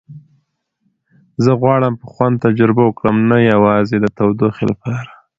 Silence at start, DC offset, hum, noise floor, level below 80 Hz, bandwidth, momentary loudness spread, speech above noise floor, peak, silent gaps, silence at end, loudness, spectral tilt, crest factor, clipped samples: 0.1 s; under 0.1%; none; -66 dBFS; -48 dBFS; 7.4 kHz; 9 LU; 52 dB; 0 dBFS; none; 0.3 s; -14 LUFS; -9 dB/octave; 14 dB; under 0.1%